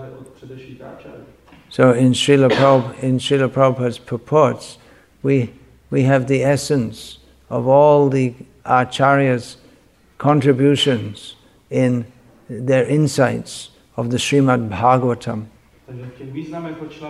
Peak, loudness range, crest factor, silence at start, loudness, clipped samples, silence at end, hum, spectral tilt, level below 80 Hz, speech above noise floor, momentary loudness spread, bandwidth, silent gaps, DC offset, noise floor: 0 dBFS; 4 LU; 16 dB; 0 s; -17 LUFS; under 0.1%; 0 s; none; -6 dB/octave; -54 dBFS; 35 dB; 22 LU; 12.5 kHz; none; under 0.1%; -52 dBFS